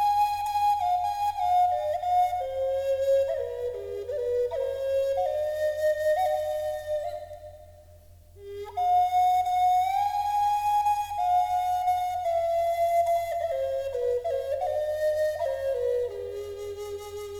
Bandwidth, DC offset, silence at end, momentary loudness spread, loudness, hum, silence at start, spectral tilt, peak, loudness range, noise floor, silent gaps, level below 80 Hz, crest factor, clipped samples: 18 kHz; under 0.1%; 0 s; 12 LU; -27 LUFS; none; 0 s; -3.5 dB/octave; -16 dBFS; 4 LU; -51 dBFS; none; -56 dBFS; 10 dB; under 0.1%